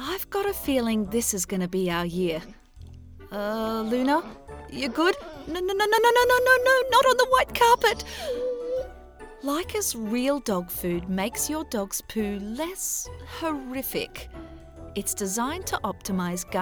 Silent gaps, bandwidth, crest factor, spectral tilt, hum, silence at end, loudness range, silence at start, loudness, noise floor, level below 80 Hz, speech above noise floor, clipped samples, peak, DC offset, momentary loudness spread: none; over 20 kHz; 20 dB; -3.5 dB/octave; none; 0 s; 10 LU; 0 s; -25 LUFS; -45 dBFS; -48 dBFS; 20 dB; under 0.1%; -6 dBFS; under 0.1%; 15 LU